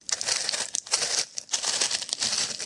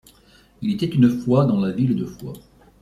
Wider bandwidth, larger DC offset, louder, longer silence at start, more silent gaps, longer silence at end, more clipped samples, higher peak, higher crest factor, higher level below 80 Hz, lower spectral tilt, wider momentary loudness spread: second, 11.5 kHz vs 14.5 kHz; neither; second, -25 LUFS vs -20 LUFS; second, 0.1 s vs 0.6 s; neither; second, 0 s vs 0.45 s; neither; about the same, -4 dBFS vs -4 dBFS; first, 24 dB vs 16 dB; second, -72 dBFS vs -52 dBFS; second, 2 dB/octave vs -8.5 dB/octave; second, 3 LU vs 19 LU